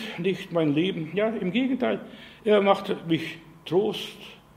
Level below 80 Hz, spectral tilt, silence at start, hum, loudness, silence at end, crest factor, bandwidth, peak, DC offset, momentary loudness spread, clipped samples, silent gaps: -64 dBFS; -6.5 dB/octave; 0 s; none; -26 LUFS; 0.2 s; 20 dB; 15.5 kHz; -6 dBFS; under 0.1%; 14 LU; under 0.1%; none